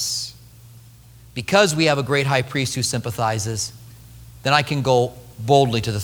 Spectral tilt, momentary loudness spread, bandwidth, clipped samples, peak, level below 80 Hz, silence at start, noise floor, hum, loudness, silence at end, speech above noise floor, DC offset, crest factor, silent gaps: -4 dB/octave; 12 LU; over 20 kHz; under 0.1%; 0 dBFS; -50 dBFS; 0 s; -46 dBFS; none; -20 LUFS; 0 s; 26 dB; under 0.1%; 20 dB; none